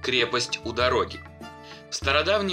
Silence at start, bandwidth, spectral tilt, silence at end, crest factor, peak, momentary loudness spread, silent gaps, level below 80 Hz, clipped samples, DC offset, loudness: 0 s; 16 kHz; -3 dB/octave; 0 s; 20 dB; -6 dBFS; 21 LU; none; -46 dBFS; under 0.1%; under 0.1%; -24 LUFS